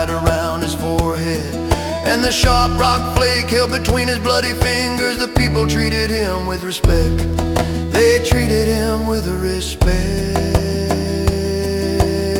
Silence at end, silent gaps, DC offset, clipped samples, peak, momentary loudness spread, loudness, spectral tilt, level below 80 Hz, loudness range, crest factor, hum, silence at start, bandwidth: 0 s; none; under 0.1%; under 0.1%; 0 dBFS; 6 LU; -17 LUFS; -5 dB/octave; -24 dBFS; 2 LU; 16 dB; none; 0 s; 18 kHz